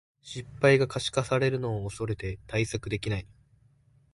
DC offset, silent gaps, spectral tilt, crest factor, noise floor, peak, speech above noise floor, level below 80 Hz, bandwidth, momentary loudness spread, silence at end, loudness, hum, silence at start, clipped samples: under 0.1%; none; -5.5 dB/octave; 20 dB; -63 dBFS; -8 dBFS; 35 dB; -50 dBFS; 11.5 kHz; 13 LU; 0.9 s; -28 LUFS; none; 0.25 s; under 0.1%